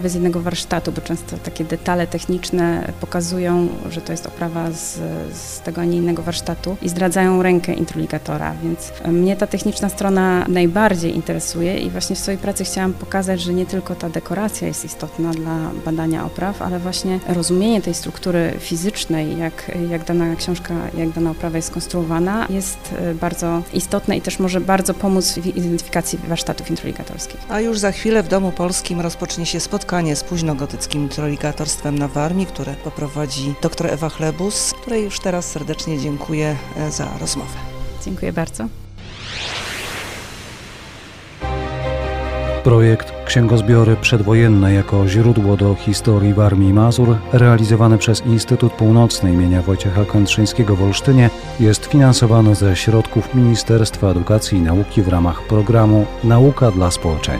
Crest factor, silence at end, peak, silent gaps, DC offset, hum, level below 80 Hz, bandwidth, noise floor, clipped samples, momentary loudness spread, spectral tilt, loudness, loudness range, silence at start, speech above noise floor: 16 dB; 0 s; 0 dBFS; none; under 0.1%; none; -34 dBFS; 15.5 kHz; -37 dBFS; under 0.1%; 12 LU; -6 dB/octave; -17 LUFS; 9 LU; 0 s; 20 dB